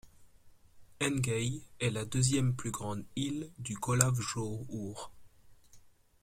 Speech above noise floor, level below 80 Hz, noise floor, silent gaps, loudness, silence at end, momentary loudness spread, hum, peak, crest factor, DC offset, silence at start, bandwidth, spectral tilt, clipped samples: 25 dB; -60 dBFS; -59 dBFS; none; -34 LUFS; 0.35 s; 12 LU; none; -6 dBFS; 30 dB; under 0.1%; 0.05 s; 16 kHz; -4.5 dB/octave; under 0.1%